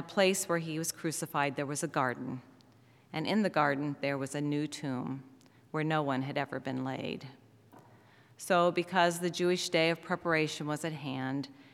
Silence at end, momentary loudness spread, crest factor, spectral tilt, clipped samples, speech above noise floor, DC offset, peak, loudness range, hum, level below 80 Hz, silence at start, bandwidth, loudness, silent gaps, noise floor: 0.05 s; 12 LU; 20 dB; -4.5 dB/octave; under 0.1%; 29 dB; under 0.1%; -12 dBFS; 6 LU; none; -80 dBFS; 0 s; 16.5 kHz; -32 LUFS; none; -62 dBFS